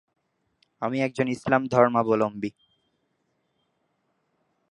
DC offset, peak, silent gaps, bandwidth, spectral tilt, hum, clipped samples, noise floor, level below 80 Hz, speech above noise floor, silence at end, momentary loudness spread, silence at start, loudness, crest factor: under 0.1%; -4 dBFS; none; 11 kHz; -7 dB/octave; none; under 0.1%; -74 dBFS; -68 dBFS; 50 dB; 2.2 s; 13 LU; 0.8 s; -24 LUFS; 24 dB